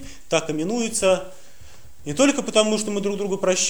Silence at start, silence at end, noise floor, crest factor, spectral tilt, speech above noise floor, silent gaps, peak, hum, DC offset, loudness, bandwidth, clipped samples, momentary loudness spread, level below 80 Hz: 0 s; 0 s; -48 dBFS; 20 dB; -3 dB/octave; 27 dB; none; -2 dBFS; none; 1%; -22 LUFS; over 20 kHz; under 0.1%; 7 LU; -52 dBFS